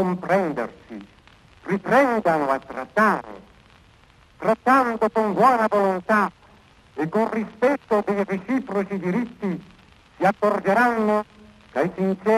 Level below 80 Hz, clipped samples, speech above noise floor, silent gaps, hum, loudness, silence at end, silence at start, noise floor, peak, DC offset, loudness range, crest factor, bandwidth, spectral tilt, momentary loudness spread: -60 dBFS; under 0.1%; 32 dB; none; none; -22 LUFS; 0 s; 0 s; -53 dBFS; -4 dBFS; under 0.1%; 3 LU; 18 dB; 14 kHz; -7 dB/octave; 12 LU